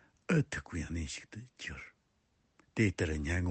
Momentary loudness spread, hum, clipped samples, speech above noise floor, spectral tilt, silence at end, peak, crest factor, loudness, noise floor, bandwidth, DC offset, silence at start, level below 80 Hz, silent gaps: 15 LU; none; under 0.1%; 40 dB; -6 dB/octave; 0 s; -16 dBFS; 20 dB; -36 LUFS; -75 dBFS; 8.8 kHz; under 0.1%; 0.3 s; -52 dBFS; none